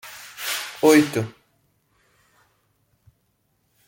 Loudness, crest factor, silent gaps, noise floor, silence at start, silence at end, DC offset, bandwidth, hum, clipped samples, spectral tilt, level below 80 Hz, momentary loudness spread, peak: -20 LUFS; 22 dB; none; -69 dBFS; 0.05 s; 2.6 s; under 0.1%; 17 kHz; none; under 0.1%; -4.5 dB/octave; -68 dBFS; 18 LU; -4 dBFS